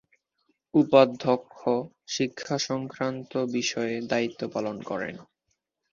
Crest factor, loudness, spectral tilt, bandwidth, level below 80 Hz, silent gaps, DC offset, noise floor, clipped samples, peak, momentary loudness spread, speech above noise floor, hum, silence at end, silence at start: 24 dB; -27 LUFS; -4.5 dB/octave; 7.4 kHz; -68 dBFS; none; under 0.1%; -78 dBFS; under 0.1%; -4 dBFS; 13 LU; 52 dB; none; 0.7 s; 0.75 s